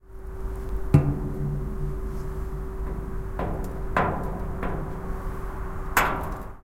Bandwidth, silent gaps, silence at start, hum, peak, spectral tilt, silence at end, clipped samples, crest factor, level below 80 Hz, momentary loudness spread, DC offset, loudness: 16.5 kHz; none; 0.05 s; none; -4 dBFS; -6.5 dB/octave; 0 s; under 0.1%; 24 dB; -32 dBFS; 12 LU; under 0.1%; -29 LUFS